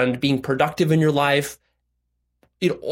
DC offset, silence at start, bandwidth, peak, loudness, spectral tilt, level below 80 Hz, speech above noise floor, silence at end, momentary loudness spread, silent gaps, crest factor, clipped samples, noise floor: under 0.1%; 0 s; 16.5 kHz; -4 dBFS; -20 LUFS; -6 dB/octave; -58 dBFS; 53 dB; 0 s; 7 LU; none; 16 dB; under 0.1%; -73 dBFS